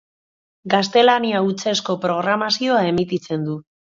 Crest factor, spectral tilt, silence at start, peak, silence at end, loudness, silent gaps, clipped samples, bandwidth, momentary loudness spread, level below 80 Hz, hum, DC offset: 18 dB; -4.5 dB/octave; 0.65 s; 0 dBFS; 0.25 s; -19 LUFS; none; under 0.1%; 7.6 kHz; 10 LU; -58 dBFS; none; under 0.1%